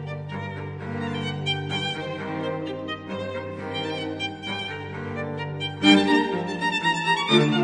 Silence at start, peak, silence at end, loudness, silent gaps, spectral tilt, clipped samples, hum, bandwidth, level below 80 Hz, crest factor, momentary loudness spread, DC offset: 0 s; -4 dBFS; 0 s; -25 LUFS; none; -5 dB/octave; under 0.1%; none; 10 kHz; -62 dBFS; 22 dB; 14 LU; under 0.1%